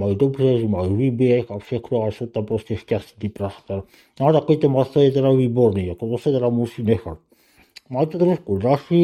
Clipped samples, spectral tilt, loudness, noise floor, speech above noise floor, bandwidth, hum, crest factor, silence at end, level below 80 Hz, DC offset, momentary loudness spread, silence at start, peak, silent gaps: under 0.1%; -9 dB/octave; -20 LUFS; -53 dBFS; 34 dB; 12.5 kHz; none; 18 dB; 0 s; -54 dBFS; under 0.1%; 11 LU; 0 s; -2 dBFS; none